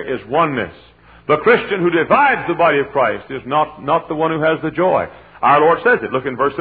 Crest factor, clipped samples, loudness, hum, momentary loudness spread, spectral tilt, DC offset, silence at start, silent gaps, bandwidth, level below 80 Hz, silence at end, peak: 16 dB; under 0.1%; -16 LUFS; none; 7 LU; -9.5 dB/octave; under 0.1%; 0 s; none; 4.8 kHz; -50 dBFS; 0 s; 0 dBFS